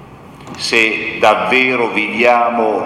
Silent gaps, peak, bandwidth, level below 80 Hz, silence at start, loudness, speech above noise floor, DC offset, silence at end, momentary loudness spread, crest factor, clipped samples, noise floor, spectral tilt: none; 0 dBFS; 15 kHz; -52 dBFS; 0 s; -13 LUFS; 22 dB; under 0.1%; 0 s; 4 LU; 14 dB; under 0.1%; -36 dBFS; -3.5 dB/octave